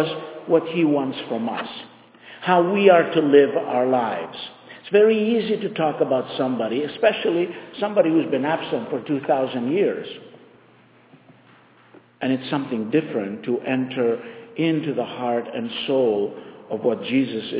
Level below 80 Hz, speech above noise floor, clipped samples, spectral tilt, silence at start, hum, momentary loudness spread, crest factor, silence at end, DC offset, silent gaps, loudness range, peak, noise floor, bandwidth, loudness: -72 dBFS; 32 dB; under 0.1%; -10 dB/octave; 0 s; none; 13 LU; 20 dB; 0 s; under 0.1%; none; 8 LU; -2 dBFS; -53 dBFS; 4 kHz; -22 LUFS